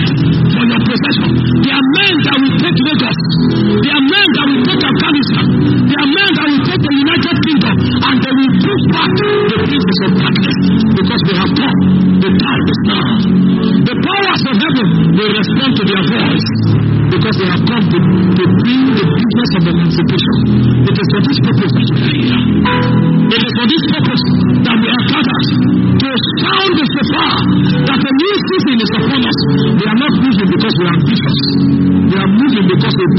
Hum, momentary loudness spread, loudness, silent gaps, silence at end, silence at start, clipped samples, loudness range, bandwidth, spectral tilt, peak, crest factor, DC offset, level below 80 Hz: none; 2 LU; -11 LUFS; none; 0 s; 0 s; under 0.1%; 1 LU; 6 kHz; -5 dB/octave; 0 dBFS; 10 dB; under 0.1%; -38 dBFS